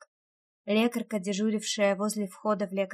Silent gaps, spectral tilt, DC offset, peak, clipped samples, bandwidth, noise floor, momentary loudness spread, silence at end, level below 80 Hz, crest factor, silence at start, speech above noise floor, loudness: none; -4.5 dB/octave; under 0.1%; -14 dBFS; under 0.1%; 15 kHz; under -90 dBFS; 5 LU; 0 s; -80 dBFS; 16 dB; 0.65 s; over 62 dB; -29 LUFS